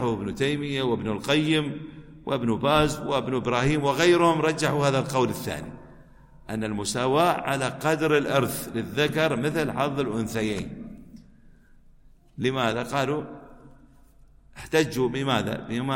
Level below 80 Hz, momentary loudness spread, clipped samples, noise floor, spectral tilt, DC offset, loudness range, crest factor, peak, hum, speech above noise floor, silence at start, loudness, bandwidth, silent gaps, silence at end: -50 dBFS; 12 LU; under 0.1%; -53 dBFS; -5 dB/octave; under 0.1%; 7 LU; 20 dB; -6 dBFS; none; 29 dB; 0 s; -25 LUFS; 16.5 kHz; none; 0 s